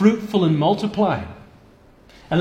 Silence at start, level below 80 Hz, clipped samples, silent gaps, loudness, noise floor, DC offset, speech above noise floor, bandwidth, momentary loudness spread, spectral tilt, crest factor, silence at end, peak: 0 s; -50 dBFS; under 0.1%; none; -20 LUFS; -50 dBFS; under 0.1%; 31 dB; 9.2 kHz; 9 LU; -7.5 dB/octave; 18 dB; 0 s; -2 dBFS